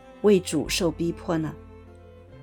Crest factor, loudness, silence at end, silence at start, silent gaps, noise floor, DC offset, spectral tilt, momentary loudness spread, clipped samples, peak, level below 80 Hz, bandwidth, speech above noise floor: 18 dB; -25 LUFS; 0 s; 0.05 s; none; -47 dBFS; under 0.1%; -5 dB/octave; 11 LU; under 0.1%; -8 dBFS; -48 dBFS; 19 kHz; 24 dB